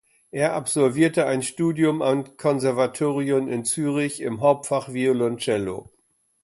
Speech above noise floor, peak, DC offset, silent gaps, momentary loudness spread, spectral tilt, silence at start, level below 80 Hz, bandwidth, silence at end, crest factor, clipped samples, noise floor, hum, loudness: 45 dB; -6 dBFS; under 0.1%; none; 5 LU; -5 dB/octave; 0.35 s; -62 dBFS; 12 kHz; 0.6 s; 18 dB; under 0.1%; -67 dBFS; none; -23 LUFS